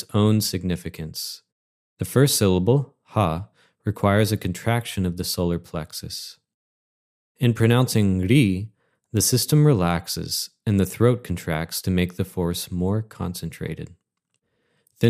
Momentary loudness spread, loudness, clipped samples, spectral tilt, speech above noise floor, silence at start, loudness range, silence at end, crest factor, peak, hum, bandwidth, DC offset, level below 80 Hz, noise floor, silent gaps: 14 LU; -23 LUFS; under 0.1%; -5.5 dB/octave; 54 dB; 0 s; 7 LU; 0 s; 18 dB; -4 dBFS; none; 15.5 kHz; under 0.1%; -52 dBFS; -76 dBFS; 1.52-1.97 s, 6.54-7.35 s